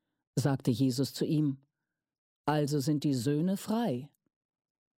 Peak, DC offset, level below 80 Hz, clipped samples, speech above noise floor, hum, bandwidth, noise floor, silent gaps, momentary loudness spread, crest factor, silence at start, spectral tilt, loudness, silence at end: -14 dBFS; under 0.1%; -72 dBFS; under 0.1%; 59 dB; none; 16.5 kHz; -89 dBFS; 2.18-2.44 s; 7 LU; 18 dB; 0.35 s; -6.5 dB/octave; -31 LUFS; 0.9 s